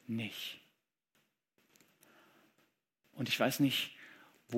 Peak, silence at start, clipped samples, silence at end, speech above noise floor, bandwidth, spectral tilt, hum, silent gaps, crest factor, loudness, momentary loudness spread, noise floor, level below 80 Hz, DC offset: -16 dBFS; 0.1 s; under 0.1%; 0 s; 44 dB; 16.5 kHz; -4 dB/octave; none; none; 24 dB; -35 LUFS; 23 LU; -79 dBFS; -86 dBFS; under 0.1%